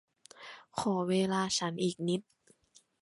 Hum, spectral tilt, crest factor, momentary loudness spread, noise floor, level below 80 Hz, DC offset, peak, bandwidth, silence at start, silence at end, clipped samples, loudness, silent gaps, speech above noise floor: none; -4.5 dB/octave; 18 dB; 19 LU; -66 dBFS; -72 dBFS; under 0.1%; -16 dBFS; 11.5 kHz; 0.4 s; 0.8 s; under 0.1%; -32 LUFS; none; 35 dB